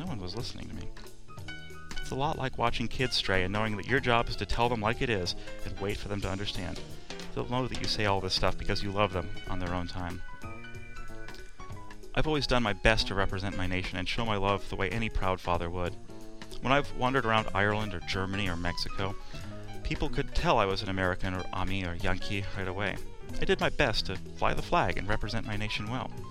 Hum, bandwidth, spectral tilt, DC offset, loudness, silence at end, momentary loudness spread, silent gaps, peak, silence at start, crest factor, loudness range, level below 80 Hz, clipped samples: none; 13 kHz; -5 dB/octave; 0.7%; -31 LUFS; 0 s; 17 LU; none; -6 dBFS; 0 s; 24 dB; 4 LU; -38 dBFS; under 0.1%